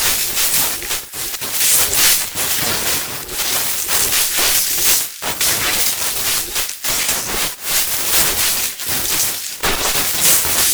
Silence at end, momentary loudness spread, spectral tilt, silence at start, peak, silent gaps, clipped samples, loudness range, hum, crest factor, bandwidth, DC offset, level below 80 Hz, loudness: 0 s; 8 LU; 0.5 dB/octave; 0 s; 0 dBFS; none; under 0.1%; 2 LU; none; 16 dB; over 20 kHz; under 0.1%; -40 dBFS; -14 LUFS